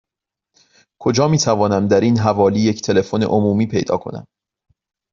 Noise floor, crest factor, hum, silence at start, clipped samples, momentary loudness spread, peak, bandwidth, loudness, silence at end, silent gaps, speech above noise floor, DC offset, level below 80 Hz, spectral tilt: -85 dBFS; 16 dB; none; 1 s; under 0.1%; 8 LU; -2 dBFS; 7.4 kHz; -17 LUFS; 0.9 s; none; 70 dB; under 0.1%; -52 dBFS; -6 dB/octave